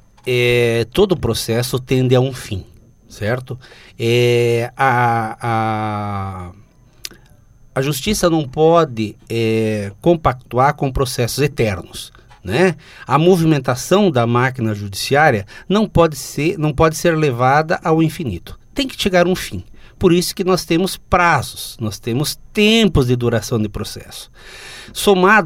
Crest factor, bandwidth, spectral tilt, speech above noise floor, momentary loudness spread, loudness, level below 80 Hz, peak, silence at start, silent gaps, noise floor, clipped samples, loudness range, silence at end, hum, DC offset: 16 dB; 16.5 kHz; -5.5 dB/octave; 30 dB; 15 LU; -16 LUFS; -38 dBFS; 0 dBFS; 0.25 s; none; -46 dBFS; under 0.1%; 3 LU; 0 s; none; under 0.1%